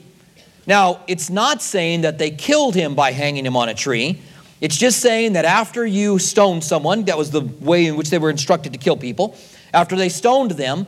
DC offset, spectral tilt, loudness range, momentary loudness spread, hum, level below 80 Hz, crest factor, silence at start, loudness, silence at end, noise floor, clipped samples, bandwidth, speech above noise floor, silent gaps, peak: under 0.1%; -4 dB/octave; 2 LU; 7 LU; none; -64 dBFS; 18 dB; 0.65 s; -17 LUFS; 0 s; -49 dBFS; under 0.1%; 16 kHz; 32 dB; none; 0 dBFS